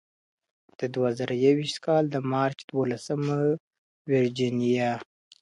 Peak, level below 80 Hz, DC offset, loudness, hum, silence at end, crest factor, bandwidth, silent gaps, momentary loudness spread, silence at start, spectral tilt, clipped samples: -10 dBFS; -70 dBFS; under 0.1%; -27 LUFS; none; 0.4 s; 18 dB; 11.5 kHz; 2.64-2.68 s, 3.60-3.71 s, 3.78-4.05 s; 8 LU; 0.8 s; -6.5 dB/octave; under 0.1%